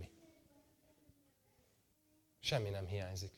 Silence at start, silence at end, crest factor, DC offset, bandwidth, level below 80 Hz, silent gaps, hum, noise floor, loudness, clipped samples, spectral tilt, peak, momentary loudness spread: 0 s; 0.05 s; 24 dB; under 0.1%; 18 kHz; -68 dBFS; none; none; -75 dBFS; -41 LUFS; under 0.1%; -4.5 dB/octave; -24 dBFS; 7 LU